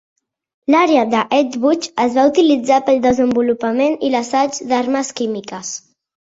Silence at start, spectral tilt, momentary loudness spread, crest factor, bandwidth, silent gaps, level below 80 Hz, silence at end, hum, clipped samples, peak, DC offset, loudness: 0.7 s; -4 dB/octave; 11 LU; 14 dB; 8 kHz; none; -54 dBFS; 0.5 s; none; under 0.1%; -2 dBFS; under 0.1%; -16 LUFS